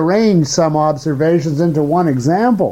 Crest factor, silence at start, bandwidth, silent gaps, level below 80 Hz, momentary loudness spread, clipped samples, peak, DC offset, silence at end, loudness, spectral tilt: 10 dB; 0 s; 14 kHz; none; -48 dBFS; 3 LU; under 0.1%; -2 dBFS; under 0.1%; 0 s; -14 LUFS; -6.5 dB/octave